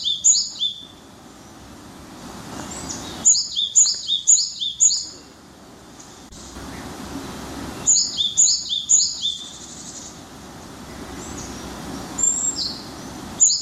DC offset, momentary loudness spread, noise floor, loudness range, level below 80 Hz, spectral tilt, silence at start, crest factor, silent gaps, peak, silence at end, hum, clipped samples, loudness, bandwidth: under 0.1%; 23 LU; -44 dBFS; 8 LU; -50 dBFS; 0 dB/octave; 0 s; 20 dB; none; -4 dBFS; 0 s; none; under 0.1%; -17 LUFS; 16 kHz